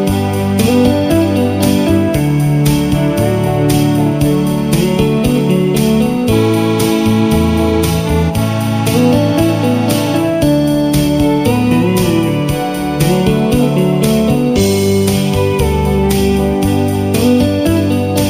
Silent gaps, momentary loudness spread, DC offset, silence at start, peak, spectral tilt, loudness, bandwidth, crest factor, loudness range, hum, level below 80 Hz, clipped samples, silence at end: none; 2 LU; 0.4%; 0 s; 0 dBFS; -6.5 dB/octave; -12 LUFS; 15.5 kHz; 12 dB; 0 LU; none; -28 dBFS; under 0.1%; 0 s